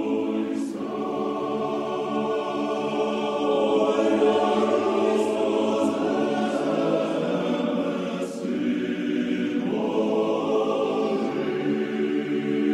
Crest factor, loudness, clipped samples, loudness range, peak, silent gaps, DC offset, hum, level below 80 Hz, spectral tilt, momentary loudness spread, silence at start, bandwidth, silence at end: 14 dB; -25 LUFS; under 0.1%; 3 LU; -10 dBFS; none; under 0.1%; none; -68 dBFS; -6 dB/octave; 6 LU; 0 s; 11.5 kHz; 0 s